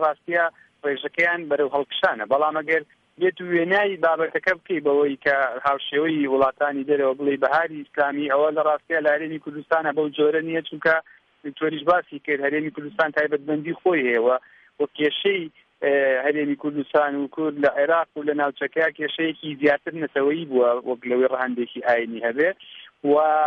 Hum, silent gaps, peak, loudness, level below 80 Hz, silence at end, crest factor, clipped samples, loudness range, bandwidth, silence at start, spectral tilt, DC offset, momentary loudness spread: none; none; -6 dBFS; -22 LUFS; -68 dBFS; 0 s; 16 dB; under 0.1%; 2 LU; 6.6 kHz; 0 s; -6.5 dB/octave; under 0.1%; 7 LU